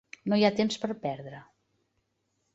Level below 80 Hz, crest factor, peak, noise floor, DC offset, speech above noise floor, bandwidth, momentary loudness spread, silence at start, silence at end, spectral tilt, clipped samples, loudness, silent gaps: -70 dBFS; 22 dB; -10 dBFS; -77 dBFS; under 0.1%; 49 dB; 8 kHz; 20 LU; 0.25 s; 1.1 s; -5.5 dB/octave; under 0.1%; -28 LUFS; none